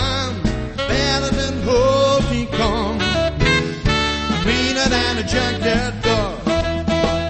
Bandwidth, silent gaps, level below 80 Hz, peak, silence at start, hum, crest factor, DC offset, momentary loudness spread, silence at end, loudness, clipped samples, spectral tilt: 8.8 kHz; none; -28 dBFS; -2 dBFS; 0 s; none; 16 dB; under 0.1%; 5 LU; 0 s; -18 LUFS; under 0.1%; -4.5 dB/octave